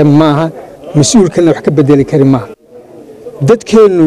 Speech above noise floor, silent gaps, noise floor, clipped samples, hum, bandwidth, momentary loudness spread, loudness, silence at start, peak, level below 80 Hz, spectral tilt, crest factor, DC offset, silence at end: 27 dB; none; -34 dBFS; 0.8%; none; 12.5 kHz; 11 LU; -9 LUFS; 0 s; 0 dBFS; -40 dBFS; -6.5 dB/octave; 8 dB; under 0.1%; 0 s